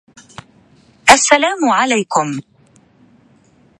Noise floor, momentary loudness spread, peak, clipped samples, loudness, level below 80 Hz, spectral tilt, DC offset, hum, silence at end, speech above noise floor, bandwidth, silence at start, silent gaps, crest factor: -51 dBFS; 12 LU; 0 dBFS; 0.2%; -12 LUFS; -52 dBFS; -2 dB/octave; under 0.1%; none; 1.4 s; 37 dB; 16 kHz; 1.05 s; none; 16 dB